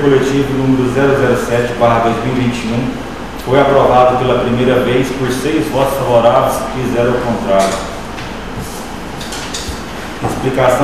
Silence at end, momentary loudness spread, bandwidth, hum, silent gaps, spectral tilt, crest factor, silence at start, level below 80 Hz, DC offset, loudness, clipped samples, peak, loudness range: 0 s; 14 LU; 15 kHz; none; none; -5.5 dB/octave; 14 dB; 0 s; -32 dBFS; 2%; -13 LUFS; under 0.1%; 0 dBFS; 6 LU